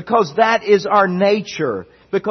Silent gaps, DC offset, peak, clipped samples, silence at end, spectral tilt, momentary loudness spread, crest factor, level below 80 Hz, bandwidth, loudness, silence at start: none; under 0.1%; 0 dBFS; under 0.1%; 0 s; -5.5 dB/octave; 9 LU; 16 dB; -58 dBFS; 6.4 kHz; -16 LUFS; 0 s